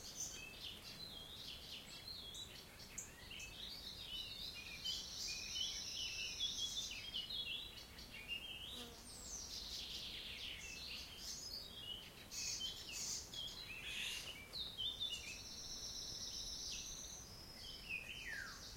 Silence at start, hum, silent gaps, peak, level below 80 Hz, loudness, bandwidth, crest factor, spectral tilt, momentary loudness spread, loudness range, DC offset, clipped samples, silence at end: 0 s; none; none; -30 dBFS; -64 dBFS; -46 LUFS; 16.5 kHz; 18 dB; -0.5 dB/octave; 9 LU; 6 LU; under 0.1%; under 0.1%; 0 s